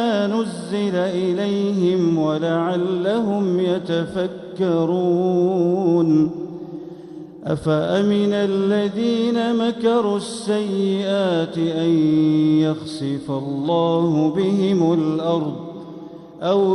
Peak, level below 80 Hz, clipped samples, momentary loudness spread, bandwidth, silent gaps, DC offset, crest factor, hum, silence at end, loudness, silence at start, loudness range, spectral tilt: -8 dBFS; -58 dBFS; under 0.1%; 10 LU; 11 kHz; none; under 0.1%; 12 dB; none; 0 s; -20 LUFS; 0 s; 1 LU; -7 dB/octave